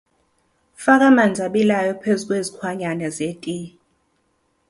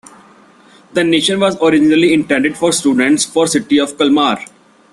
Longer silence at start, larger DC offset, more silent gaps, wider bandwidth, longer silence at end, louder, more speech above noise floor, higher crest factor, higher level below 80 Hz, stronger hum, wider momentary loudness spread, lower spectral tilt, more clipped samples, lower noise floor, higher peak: second, 0.8 s vs 0.95 s; neither; neither; about the same, 11.5 kHz vs 12.5 kHz; first, 1 s vs 0.5 s; second, -19 LUFS vs -13 LUFS; first, 48 dB vs 32 dB; first, 18 dB vs 12 dB; second, -62 dBFS vs -54 dBFS; neither; first, 15 LU vs 5 LU; first, -5.5 dB/octave vs -3.5 dB/octave; neither; first, -66 dBFS vs -45 dBFS; about the same, -2 dBFS vs 0 dBFS